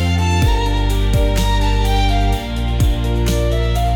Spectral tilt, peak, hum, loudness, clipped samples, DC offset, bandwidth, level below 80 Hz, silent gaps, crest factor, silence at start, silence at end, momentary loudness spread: -5.5 dB/octave; -6 dBFS; none; -17 LUFS; under 0.1%; under 0.1%; 17 kHz; -18 dBFS; none; 10 dB; 0 s; 0 s; 2 LU